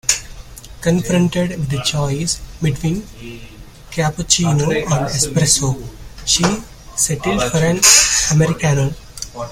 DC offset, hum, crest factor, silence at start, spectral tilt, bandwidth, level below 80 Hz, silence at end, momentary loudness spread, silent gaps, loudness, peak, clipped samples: under 0.1%; none; 18 dB; 0.05 s; -3.5 dB/octave; 17 kHz; -36 dBFS; 0 s; 16 LU; none; -15 LUFS; 0 dBFS; under 0.1%